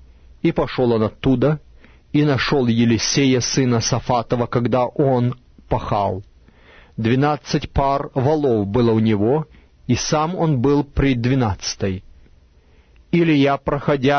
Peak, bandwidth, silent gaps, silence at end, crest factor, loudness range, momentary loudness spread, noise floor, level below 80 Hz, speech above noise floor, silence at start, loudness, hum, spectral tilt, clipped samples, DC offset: -4 dBFS; 6.6 kHz; none; 0 s; 16 dB; 3 LU; 8 LU; -51 dBFS; -38 dBFS; 34 dB; 0.45 s; -19 LUFS; none; -5.5 dB/octave; under 0.1%; under 0.1%